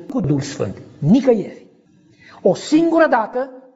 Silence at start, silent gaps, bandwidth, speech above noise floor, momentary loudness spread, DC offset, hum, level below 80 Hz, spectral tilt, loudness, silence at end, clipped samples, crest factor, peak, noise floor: 0 s; none; 8 kHz; 35 dB; 12 LU; under 0.1%; none; -54 dBFS; -6.5 dB/octave; -17 LUFS; 0.15 s; under 0.1%; 16 dB; -2 dBFS; -52 dBFS